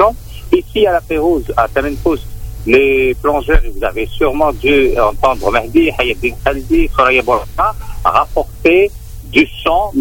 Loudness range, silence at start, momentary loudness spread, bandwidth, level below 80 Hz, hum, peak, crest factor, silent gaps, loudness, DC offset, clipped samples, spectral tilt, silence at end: 1 LU; 0 s; 7 LU; 17 kHz; -24 dBFS; none; 0 dBFS; 12 dB; none; -13 LUFS; under 0.1%; under 0.1%; -6 dB/octave; 0 s